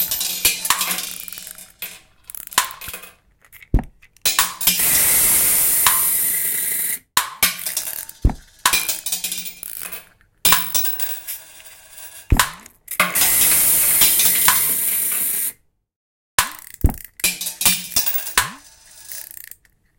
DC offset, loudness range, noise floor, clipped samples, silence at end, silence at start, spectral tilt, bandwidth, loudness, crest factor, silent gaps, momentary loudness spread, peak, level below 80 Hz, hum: under 0.1%; 7 LU; -49 dBFS; under 0.1%; 0.75 s; 0 s; -0.5 dB/octave; 17.5 kHz; -16 LUFS; 20 dB; 15.96-16.38 s; 20 LU; 0 dBFS; -32 dBFS; none